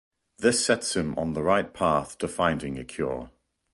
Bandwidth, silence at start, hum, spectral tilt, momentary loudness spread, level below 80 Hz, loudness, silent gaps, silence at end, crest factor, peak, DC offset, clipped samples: 11.5 kHz; 0.4 s; none; -4 dB/octave; 9 LU; -50 dBFS; -26 LUFS; none; 0.45 s; 18 dB; -8 dBFS; under 0.1%; under 0.1%